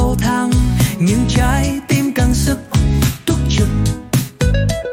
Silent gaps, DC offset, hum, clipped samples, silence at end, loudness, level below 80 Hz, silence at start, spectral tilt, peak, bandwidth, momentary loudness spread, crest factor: none; under 0.1%; none; under 0.1%; 0 s; -16 LUFS; -20 dBFS; 0 s; -5.5 dB/octave; -2 dBFS; 17 kHz; 3 LU; 12 dB